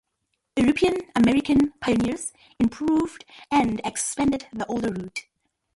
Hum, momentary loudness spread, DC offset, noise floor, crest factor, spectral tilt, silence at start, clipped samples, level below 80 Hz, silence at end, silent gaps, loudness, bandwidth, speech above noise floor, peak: none; 12 LU; under 0.1%; -77 dBFS; 14 dB; -4.5 dB/octave; 0.55 s; under 0.1%; -48 dBFS; 0.55 s; none; -24 LUFS; 11.5 kHz; 54 dB; -10 dBFS